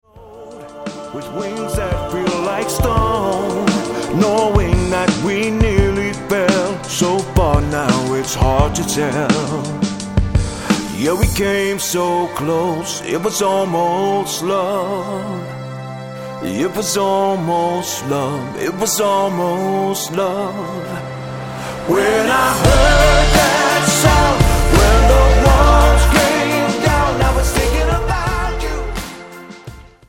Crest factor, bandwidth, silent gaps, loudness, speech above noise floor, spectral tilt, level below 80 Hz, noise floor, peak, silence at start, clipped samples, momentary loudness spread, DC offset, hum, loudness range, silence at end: 16 dB; 17 kHz; none; -16 LUFS; 21 dB; -4.5 dB/octave; -22 dBFS; -37 dBFS; 0 dBFS; 0.15 s; under 0.1%; 14 LU; 0.2%; none; 7 LU; 0.25 s